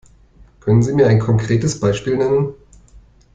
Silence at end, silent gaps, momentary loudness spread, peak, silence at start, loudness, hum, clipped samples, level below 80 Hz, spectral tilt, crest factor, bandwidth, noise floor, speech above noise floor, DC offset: 0.35 s; none; 6 LU; -2 dBFS; 0.65 s; -16 LUFS; none; under 0.1%; -42 dBFS; -7 dB/octave; 16 dB; 9.2 kHz; -47 dBFS; 32 dB; under 0.1%